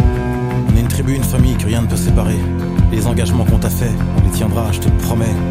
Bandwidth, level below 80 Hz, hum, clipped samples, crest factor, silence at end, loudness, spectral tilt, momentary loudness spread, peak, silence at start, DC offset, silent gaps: 16 kHz; -20 dBFS; none; under 0.1%; 12 dB; 0 s; -15 LUFS; -6.5 dB/octave; 3 LU; -2 dBFS; 0 s; under 0.1%; none